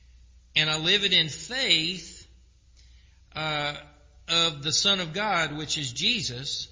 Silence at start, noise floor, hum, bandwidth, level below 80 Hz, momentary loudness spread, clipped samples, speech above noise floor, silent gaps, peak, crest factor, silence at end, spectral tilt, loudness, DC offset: 0.55 s; -56 dBFS; none; 7.8 kHz; -54 dBFS; 11 LU; under 0.1%; 29 dB; none; -6 dBFS; 22 dB; 0.05 s; -2 dB/octave; -24 LUFS; under 0.1%